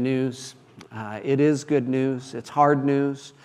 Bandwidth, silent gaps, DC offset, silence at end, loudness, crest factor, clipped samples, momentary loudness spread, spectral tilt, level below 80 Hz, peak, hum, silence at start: 11.5 kHz; none; under 0.1%; 0.15 s; -23 LUFS; 18 dB; under 0.1%; 17 LU; -7 dB/octave; -72 dBFS; -6 dBFS; none; 0 s